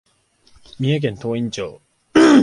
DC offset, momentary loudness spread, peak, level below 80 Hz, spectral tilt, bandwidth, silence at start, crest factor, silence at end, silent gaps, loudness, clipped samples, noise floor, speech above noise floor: under 0.1%; 14 LU; 0 dBFS; -54 dBFS; -6 dB/octave; 11 kHz; 0.8 s; 18 dB; 0 s; none; -19 LUFS; under 0.1%; -57 dBFS; 35 dB